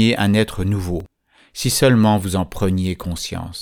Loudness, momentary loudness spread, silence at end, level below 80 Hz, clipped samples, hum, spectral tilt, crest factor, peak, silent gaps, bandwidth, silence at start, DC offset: -19 LUFS; 12 LU; 0 s; -38 dBFS; under 0.1%; none; -5.5 dB/octave; 16 dB; -4 dBFS; none; 19 kHz; 0 s; under 0.1%